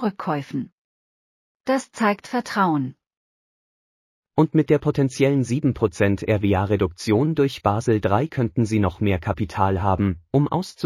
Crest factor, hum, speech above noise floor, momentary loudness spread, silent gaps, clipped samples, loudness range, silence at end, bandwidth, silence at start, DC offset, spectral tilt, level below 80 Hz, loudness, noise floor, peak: 18 dB; none; over 69 dB; 7 LU; 0.72-1.60 s, 3.17-4.23 s; under 0.1%; 5 LU; 0 s; 14.5 kHz; 0 s; under 0.1%; -7 dB/octave; -48 dBFS; -22 LUFS; under -90 dBFS; -4 dBFS